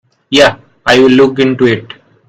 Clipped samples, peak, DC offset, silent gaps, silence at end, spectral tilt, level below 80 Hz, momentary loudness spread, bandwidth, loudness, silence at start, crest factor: 0.8%; 0 dBFS; under 0.1%; none; 0.45 s; -5 dB/octave; -44 dBFS; 8 LU; 12 kHz; -9 LUFS; 0.3 s; 10 dB